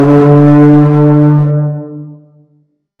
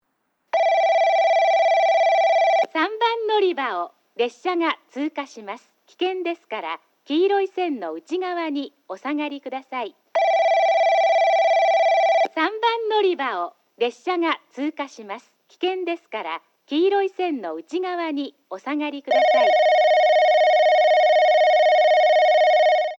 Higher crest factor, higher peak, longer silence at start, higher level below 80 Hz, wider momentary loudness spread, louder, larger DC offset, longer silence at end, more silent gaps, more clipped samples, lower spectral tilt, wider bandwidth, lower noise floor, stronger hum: about the same, 8 dB vs 12 dB; first, 0 dBFS vs -8 dBFS; second, 0 s vs 0.55 s; first, -44 dBFS vs -86 dBFS; first, 18 LU vs 15 LU; first, -7 LUFS vs -20 LUFS; neither; first, 0.85 s vs 0.05 s; neither; neither; first, -11 dB/octave vs -2.5 dB/octave; second, 3.9 kHz vs 7.6 kHz; second, -54 dBFS vs -72 dBFS; first, 50 Hz at -25 dBFS vs none